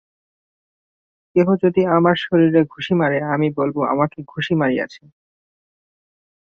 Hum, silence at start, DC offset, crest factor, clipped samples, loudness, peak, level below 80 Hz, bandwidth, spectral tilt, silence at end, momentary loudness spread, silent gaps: none; 1.35 s; under 0.1%; 18 dB; under 0.1%; -18 LUFS; -2 dBFS; -58 dBFS; 6.8 kHz; -8.5 dB/octave; 1.5 s; 7 LU; none